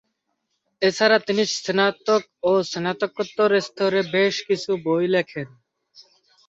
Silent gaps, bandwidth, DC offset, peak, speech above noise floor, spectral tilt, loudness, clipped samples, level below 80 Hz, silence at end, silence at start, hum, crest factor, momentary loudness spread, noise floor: none; 8 kHz; under 0.1%; -4 dBFS; 54 dB; -4 dB/octave; -21 LUFS; under 0.1%; -68 dBFS; 1 s; 0.8 s; none; 18 dB; 7 LU; -75 dBFS